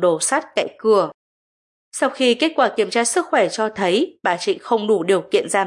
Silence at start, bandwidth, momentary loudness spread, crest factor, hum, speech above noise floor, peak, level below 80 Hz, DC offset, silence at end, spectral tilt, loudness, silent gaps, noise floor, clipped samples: 0 s; 11.5 kHz; 5 LU; 16 dB; none; over 72 dB; -4 dBFS; -74 dBFS; under 0.1%; 0 s; -3 dB/octave; -19 LUFS; 1.14-1.91 s; under -90 dBFS; under 0.1%